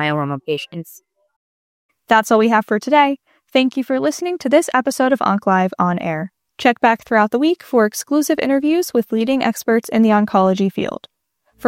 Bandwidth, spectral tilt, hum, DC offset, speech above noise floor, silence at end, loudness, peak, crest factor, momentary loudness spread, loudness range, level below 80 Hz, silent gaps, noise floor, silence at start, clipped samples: 16.5 kHz; -5 dB/octave; none; under 0.1%; 44 dB; 0 s; -17 LUFS; -2 dBFS; 16 dB; 10 LU; 1 LU; -62 dBFS; 1.36-1.89 s; -61 dBFS; 0 s; under 0.1%